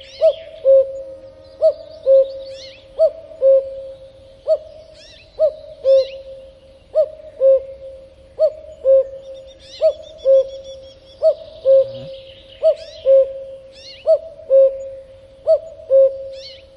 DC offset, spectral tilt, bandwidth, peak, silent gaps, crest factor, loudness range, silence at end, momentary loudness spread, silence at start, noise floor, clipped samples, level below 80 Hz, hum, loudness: under 0.1%; -4.5 dB/octave; 6.2 kHz; -4 dBFS; none; 14 dB; 3 LU; 0.3 s; 21 LU; 0.2 s; -44 dBFS; under 0.1%; -54 dBFS; none; -17 LUFS